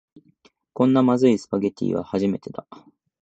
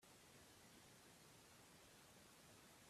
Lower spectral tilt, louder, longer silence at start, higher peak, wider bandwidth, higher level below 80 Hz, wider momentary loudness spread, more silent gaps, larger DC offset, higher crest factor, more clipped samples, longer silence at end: first, -7.5 dB/octave vs -2.5 dB/octave; first, -21 LUFS vs -66 LUFS; first, 0.8 s vs 0 s; first, -6 dBFS vs -54 dBFS; second, 8 kHz vs 15.5 kHz; first, -60 dBFS vs -86 dBFS; first, 19 LU vs 0 LU; neither; neither; about the same, 18 dB vs 14 dB; neither; first, 0.7 s vs 0 s